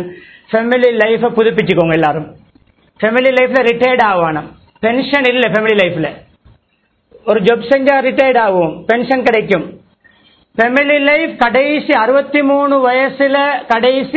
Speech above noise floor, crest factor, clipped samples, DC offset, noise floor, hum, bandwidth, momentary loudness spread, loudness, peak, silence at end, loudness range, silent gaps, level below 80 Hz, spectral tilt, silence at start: 48 dB; 12 dB; 0.1%; under 0.1%; -60 dBFS; none; 8 kHz; 7 LU; -12 LUFS; 0 dBFS; 0 s; 2 LU; none; -50 dBFS; -7 dB/octave; 0 s